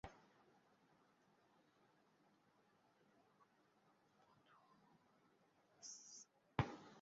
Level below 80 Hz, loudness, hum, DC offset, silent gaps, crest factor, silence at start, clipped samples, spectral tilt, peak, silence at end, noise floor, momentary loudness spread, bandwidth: -74 dBFS; -50 LUFS; none; under 0.1%; none; 36 dB; 0.05 s; under 0.1%; -5.5 dB/octave; -22 dBFS; 0 s; -78 dBFS; 15 LU; 7.6 kHz